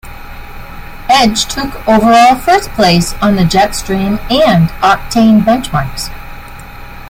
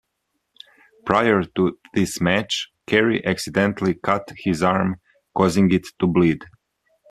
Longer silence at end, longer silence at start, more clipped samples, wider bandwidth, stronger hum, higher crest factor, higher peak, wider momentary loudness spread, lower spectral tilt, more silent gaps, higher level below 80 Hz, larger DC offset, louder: second, 0 s vs 0.65 s; second, 0.05 s vs 1.05 s; neither; first, 16.5 kHz vs 14 kHz; neither; second, 10 dB vs 20 dB; about the same, 0 dBFS vs 0 dBFS; first, 23 LU vs 8 LU; about the same, -5 dB/octave vs -5.5 dB/octave; neither; first, -28 dBFS vs -54 dBFS; neither; first, -10 LUFS vs -21 LUFS